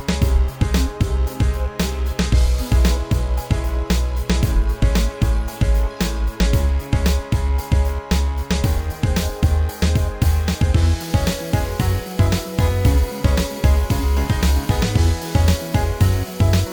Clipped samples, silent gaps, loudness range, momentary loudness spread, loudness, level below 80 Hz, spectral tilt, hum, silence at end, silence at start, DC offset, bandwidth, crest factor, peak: under 0.1%; none; 2 LU; 4 LU; -20 LUFS; -20 dBFS; -6 dB/octave; none; 0 s; 0 s; under 0.1%; over 20 kHz; 16 dB; -2 dBFS